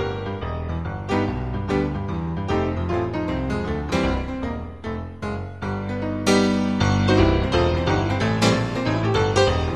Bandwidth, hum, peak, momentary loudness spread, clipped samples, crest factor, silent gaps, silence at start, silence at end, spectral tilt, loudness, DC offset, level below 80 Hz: 12.5 kHz; none; -4 dBFS; 11 LU; under 0.1%; 18 dB; none; 0 s; 0 s; -6 dB/octave; -23 LUFS; 0.5%; -34 dBFS